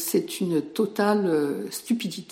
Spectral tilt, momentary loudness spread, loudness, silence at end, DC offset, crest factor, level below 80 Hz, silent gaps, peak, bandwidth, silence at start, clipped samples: -5 dB/octave; 5 LU; -25 LUFS; 0 s; under 0.1%; 14 dB; -74 dBFS; none; -10 dBFS; 16.5 kHz; 0 s; under 0.1%